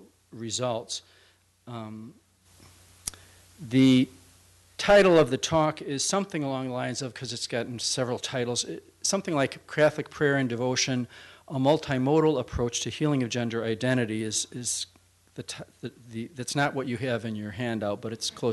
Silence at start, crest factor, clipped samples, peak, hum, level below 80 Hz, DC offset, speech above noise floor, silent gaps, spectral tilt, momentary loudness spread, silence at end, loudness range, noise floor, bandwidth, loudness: 0 s; 18 dB; under 0.1%; -10 dBFS; none; -56 dBFS; under 0.1%; 31 dB; none; -4.5 dB/octave; 17 LU; 0 s; 8 LU; -58 dBFS; 12 kHz; -27 LUFS